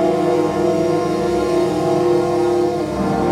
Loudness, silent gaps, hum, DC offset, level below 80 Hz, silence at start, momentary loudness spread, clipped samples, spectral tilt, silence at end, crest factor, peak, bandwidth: -17 LUFS; none; none; under 0.1%; -42 dBFS; 0 s; 2 LU; under 0.1%; -6.5 dB/octave; 0 s; 12 dB; -6 dBFS; 13 kHz